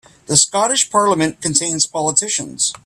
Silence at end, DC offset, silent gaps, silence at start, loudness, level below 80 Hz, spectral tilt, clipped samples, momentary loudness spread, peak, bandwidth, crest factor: 0.1 s; under 0.1%; none; 0.3 s; -15 LUFS; -56 dBFS; -2 dB/octave; under 0.1%; 4 LU; 0 dBFS; 15.5 kHz; 18 dB